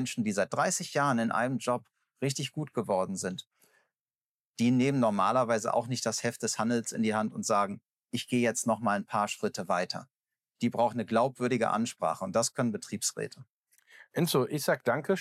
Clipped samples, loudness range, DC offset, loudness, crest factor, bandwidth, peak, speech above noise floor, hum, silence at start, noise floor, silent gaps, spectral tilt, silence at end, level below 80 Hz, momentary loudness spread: under 0.1%; 3 LU; under 0.1%; -30 LUFS; 16 dB; 15.5 kHz; -14 dBFS; over 60 dB; none; 0 s; under -90 dBFS; 3.47-3.51 s, 4.01-4.06 s, 4.15-4.54 s, 7.91-7.95 s, 13.54-13.62 s; -4.5 dB/octave; 0 s; -86 dBFS; 8 LU